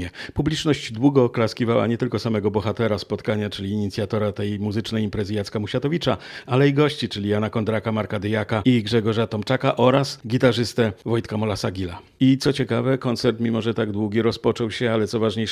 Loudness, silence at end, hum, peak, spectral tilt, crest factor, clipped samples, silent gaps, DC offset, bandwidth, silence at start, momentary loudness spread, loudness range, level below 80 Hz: -22 LUFS; 0 s; none; -2 dBFS; -6.5 dB/octave; 20 dB; under 0.1%; none; under 0.1%; 14 kHz; 0 s; 7 LU; 4 LU; -52 dBFS